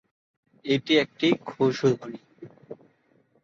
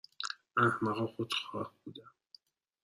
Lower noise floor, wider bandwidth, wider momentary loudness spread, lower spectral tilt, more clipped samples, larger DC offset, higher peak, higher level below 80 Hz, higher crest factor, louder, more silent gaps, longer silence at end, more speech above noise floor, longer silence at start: about the same, -65 dBFS vs -64 dBFS; second, 7.6 kHz vs 14 kHz; first, 24 LU vs 21 LU; about the same, -5.5 dB/octave vs -5 dB/octave; neither; neither; first, -8 dBFS vs -14 dBFS; first, -70 dBFS vs -76 dBFS; second, 18 dB vs 24 dB; first, -24 LUFS vs -34 LUFS; neither; about the same, 0.7 s vs 0.75 s; first, 41 dB vs 29 dB; first, 0.65 s vs 0.2 s